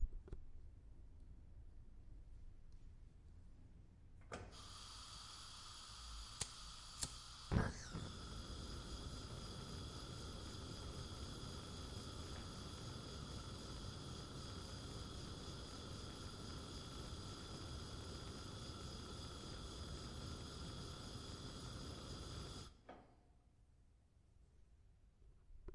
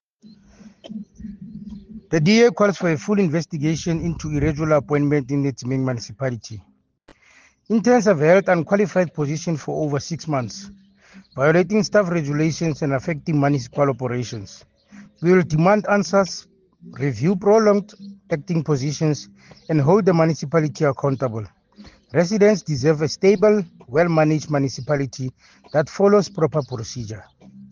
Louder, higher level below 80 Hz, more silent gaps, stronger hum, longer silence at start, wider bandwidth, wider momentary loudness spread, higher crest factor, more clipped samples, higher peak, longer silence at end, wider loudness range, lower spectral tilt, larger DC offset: second, -51 LUFS vs -20 LUFS; second, -56 dBFS vs -50 dBFS; neither; neither; second, 0 s vs 0.65 s; first, 11.5 kHz vs 7.4 kHz; about the same, 16 LU vs 17 LU; first, 30 dB vs 16 dB; neither; second, -22 dBFS vs -4 dBFS; about the same, 0 s vs 0.05 s; first, 12 LU vs 3 LU; second, -4 dB/octave vs -6.5 dB/octave; neither